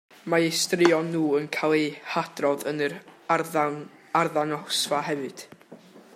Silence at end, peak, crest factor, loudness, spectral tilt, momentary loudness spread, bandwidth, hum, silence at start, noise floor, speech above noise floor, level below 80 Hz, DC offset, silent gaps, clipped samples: 0.15 s; -4 dBFS; 22 dB; -25 LUFS; -4 dB/octave; 10 LU; 16 kHz; none; 0.25 s; -49 dBFS; 24 dB; -74 dBFS; under 0.1%; none; under 0.1%